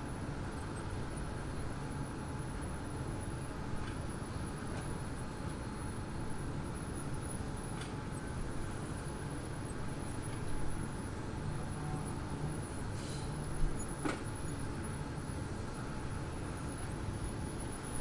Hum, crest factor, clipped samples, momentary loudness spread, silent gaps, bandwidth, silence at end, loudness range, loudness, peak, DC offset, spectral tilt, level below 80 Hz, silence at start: none; 18 dB; under 0.1%; 2 LU; none; 11.5 kHz; 0 s; 1 LU; -42 LUFS; -20 dBFS; under 0.1%; -5.5 dB/octave; -46 dBFS; 0 s